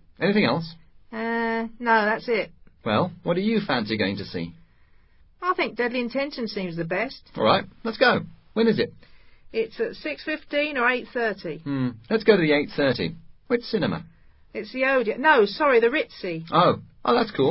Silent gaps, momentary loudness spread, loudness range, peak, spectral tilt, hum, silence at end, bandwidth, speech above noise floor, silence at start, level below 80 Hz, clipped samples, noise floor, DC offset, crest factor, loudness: none; 12 LU; 5 LU; -2 dBFS; -10 dB/octave; none; 0 s; 5.8 kHz; 32 dB; 0.2 s; -56 dBFS; under 0.1%; -55 dBFS; under 0.1%; 22 dB; -24 LUFS